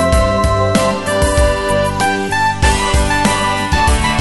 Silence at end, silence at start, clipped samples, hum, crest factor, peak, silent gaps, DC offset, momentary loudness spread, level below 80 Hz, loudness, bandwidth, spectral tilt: 0 s; 0 s; under 0.1%; none; 14 dB; 0 dBFS; none; under 0.1%; 2 LU; -20 dBFS; -14 LUFS; 12 kHz; -4.5 dB/octave